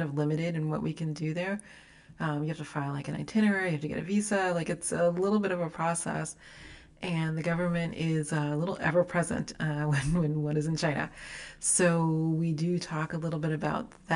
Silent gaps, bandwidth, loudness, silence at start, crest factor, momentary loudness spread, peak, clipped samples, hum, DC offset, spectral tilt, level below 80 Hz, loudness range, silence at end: none; 11.5 kHz; -30 LUFS; 0 s; 16 dB; 9 LU; -14 dBFS; under 0.1%; none; under 0.1%; -5.5 dB/octave; -56 dBFS; 3 LU; 0 s